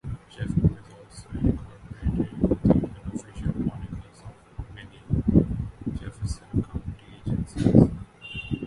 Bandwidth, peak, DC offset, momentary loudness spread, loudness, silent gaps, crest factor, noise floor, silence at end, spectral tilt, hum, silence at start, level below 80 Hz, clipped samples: 11.5 kHz; -2 dBFS; under 0.1%; 21 LU; -26 LUFS; none; 24 dB; -46 dBFS; 0 s; -8.5 dB/octave; none; 0.05 s; -36 dBFS; under 0.1%